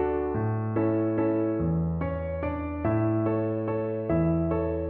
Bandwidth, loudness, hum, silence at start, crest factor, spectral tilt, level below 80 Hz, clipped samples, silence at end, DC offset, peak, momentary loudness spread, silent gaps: 3.8 kHz; -27 LUFS; none; 0 s; 12 dB; -10.5 dB/octave; -42 dBFS; under 0.1%; 0 s; under 0.1%; -14 dBFS; 5 LU; none